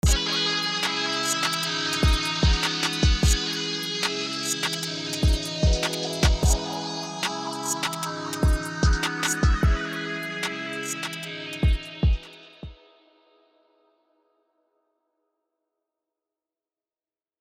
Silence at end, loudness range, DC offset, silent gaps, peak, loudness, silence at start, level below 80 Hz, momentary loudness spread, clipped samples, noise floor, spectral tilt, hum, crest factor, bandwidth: 4.65 s; 7 LU; under 0.1%; none; -6 dBFS; -25 LUFS; 0.05 s; -30 dBFS; 8 LU; under 0.1%; under -90 dBFS; -3.5 dB/octave; none; 18 dB; 16.5 kHz